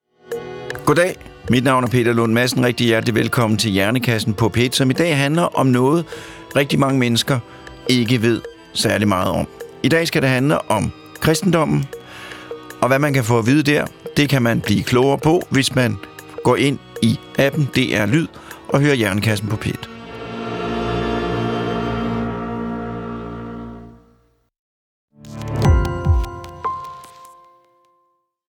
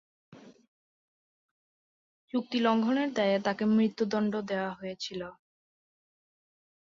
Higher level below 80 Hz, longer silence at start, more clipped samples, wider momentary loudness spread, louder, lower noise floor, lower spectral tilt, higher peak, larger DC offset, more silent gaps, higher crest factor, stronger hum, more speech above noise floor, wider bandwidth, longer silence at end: first, -36 dBFS vs -74 dBFS; about the same, 0.3 s vs 0.3 s; neither; first, 15 LU vs 11 LU; first, -18 LUFS vs -29 LUFS; second, -65 dBFS vs under -90 dBFS; about the same, -5.5 dB/octave vs -6 dB/octave; first, -2 dBFS vs -14 dBFS; neither; second, 24.59-25.08 s vs 0.68-2.28 s; about the same, 16 dB vs 18 dB; neither; second, 49 dB vs over 61 dB; first, 18.5 kHz vs 7.4 kHz; second, 1.3 s vs 1.55 s